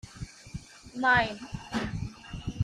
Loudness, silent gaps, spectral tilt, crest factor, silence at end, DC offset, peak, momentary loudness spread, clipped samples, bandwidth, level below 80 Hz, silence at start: -29 LUFS; none; -5 dB/octave; 20 dB; 0 s; under 0.1%; -12 dBFS; 20 LU; under 0.1%; 13.5 kHz; -48 dBFS; 0.05 s